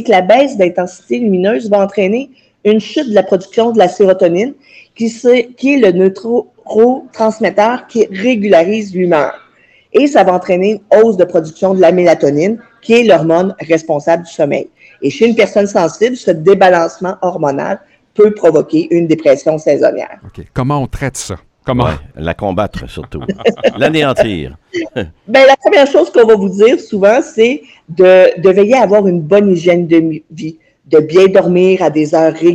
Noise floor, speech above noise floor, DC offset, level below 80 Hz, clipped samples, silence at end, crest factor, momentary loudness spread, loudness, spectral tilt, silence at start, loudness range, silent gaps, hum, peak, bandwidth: -47 dBFS; 37 dB; under 0.1%; -42 dBFS; 0.2%; 0 s; 10 dB; 12 LU; -11 LUFS; -6 dB/octave; 0 s; 6 LU; none; none; 0 dBFS; 11.5 kHz